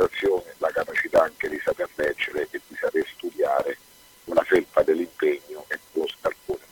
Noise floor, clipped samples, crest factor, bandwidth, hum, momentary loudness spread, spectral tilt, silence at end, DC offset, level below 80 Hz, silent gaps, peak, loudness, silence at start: -52 dBFS; under 0.1%; 20 dB; 18 kHz; none; 11 LU; -4.5 dB/octave; 0.15 s; under 0.1%; -58 dBFS; none; -6 dBFS; -25 LUFS; 0 s